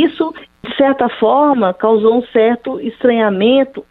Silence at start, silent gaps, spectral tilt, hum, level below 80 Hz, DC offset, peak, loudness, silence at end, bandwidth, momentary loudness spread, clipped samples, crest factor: 0 s; none; -8.5 dB/octave; none; -54 dBFS; under 0.1%; -2 dBFS; -13 LUFS; 0.1 s; 4.2 kHz; 9 LU; under 0.1%; 12 dB